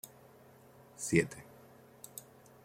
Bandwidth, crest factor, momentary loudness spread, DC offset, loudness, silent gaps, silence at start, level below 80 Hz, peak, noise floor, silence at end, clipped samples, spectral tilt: 16.5 kHz; 28 dB; 27 LU; under 0.1%; -33 LUFS; none; 0.05 s; -68 dBFS; -12 dBFS; -59 dBFS; 0.45 s; under 0.1%; -5 dB/octave